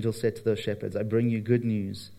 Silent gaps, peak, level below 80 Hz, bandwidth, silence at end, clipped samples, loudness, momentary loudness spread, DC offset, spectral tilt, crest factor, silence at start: none; -10 dBFS; -66 dBFS; 14.5 kHz; 0 s; under 0.1%; -28 LUFS; 6 LU; under 0.1%; -7.5 dB/octave; 16 dB; 0 s